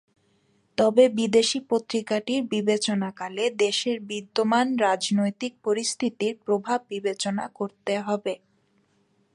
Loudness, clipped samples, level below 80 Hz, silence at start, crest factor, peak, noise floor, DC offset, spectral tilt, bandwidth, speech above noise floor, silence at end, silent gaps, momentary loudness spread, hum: -25 LUFS; under 0.1%; -72 dBFS; 0.8 s; 20 dB; -6 dBFS; -67 dBFS; under 0.1%; -4 dB/octave; 11 kHz; 42 dB; 1 s; none; 9 LU; none